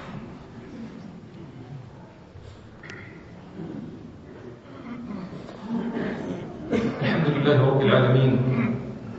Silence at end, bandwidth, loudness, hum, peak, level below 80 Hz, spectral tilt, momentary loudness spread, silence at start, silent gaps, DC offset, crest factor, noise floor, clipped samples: 0 s; 7.2 kHz; -24 LUFS; none; -6 dBFS; -54 dBFS; -8.5 dB/octave; 24 LU; 0 s; none; under 0.1%; 20 dB; -45 dBFS; under 0.1%